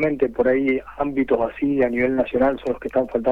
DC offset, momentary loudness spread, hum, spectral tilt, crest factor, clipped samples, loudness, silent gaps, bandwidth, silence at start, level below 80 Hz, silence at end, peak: under 0.1%; 4 LU; none; -8.5 dB/octave; 14 dB; under 0.1%; -21 LUFS; none; 4.8 kHz; 0 s; -46 dBFS; 0 s; -6 dBFS